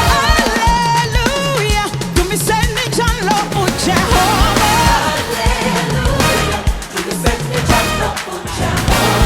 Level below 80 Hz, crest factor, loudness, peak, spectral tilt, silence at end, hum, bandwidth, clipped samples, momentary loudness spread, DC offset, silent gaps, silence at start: -22 dBFS; 14 dB; -14 LUFS; 0 dBFS; -4 dB/octave; 0 s; none; 19.5 kHz; under 0.1%; 6 LU; under 0.1%; none; 0 s